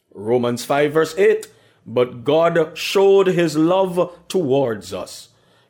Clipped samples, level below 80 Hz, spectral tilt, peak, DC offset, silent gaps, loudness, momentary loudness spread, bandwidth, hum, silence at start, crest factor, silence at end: under 0.1%; -62 dBFS; -5.5 dB/octave; -6 dBFS; under 0.1%; none; -18 LUFS; 11 LU; 17.5 kHz; none; 0.15 s; 12 dB; 0.45 s